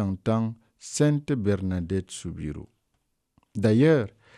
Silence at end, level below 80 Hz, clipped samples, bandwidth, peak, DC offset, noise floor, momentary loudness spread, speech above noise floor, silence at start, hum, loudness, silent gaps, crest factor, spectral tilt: 0.3 s; -52 dBFS; under 0.1%; 12.5 kHz; -10 dBFS; under 0.1%; -75 dBFS; 16 LU; 50 dB; 0 s; none; -25 LUFS; none; 16 dB; -6.5 dB/octave